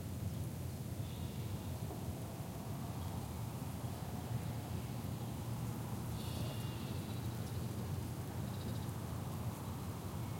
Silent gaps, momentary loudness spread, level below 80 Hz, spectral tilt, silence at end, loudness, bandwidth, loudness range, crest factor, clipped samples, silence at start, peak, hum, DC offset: none; 2 LU; -58 dBFS; -6 dB/octave; 0 s; -43 LUFS; 16.5 kHz; 1 LU; 14 dB; under 0.1%; 0 s; -30 dBFS; none; under 0.1%